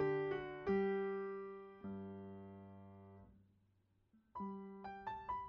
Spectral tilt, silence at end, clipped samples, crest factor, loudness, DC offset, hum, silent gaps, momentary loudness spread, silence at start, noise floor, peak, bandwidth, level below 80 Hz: -6 dB/octave; 0 s; under 0.1%; 18 dB; -44 LUFS; under 0.1%; none; none; 20 LU; 0 s; -77 dBFS; -28 dBFS; 5.6 kHz; -72 dBFS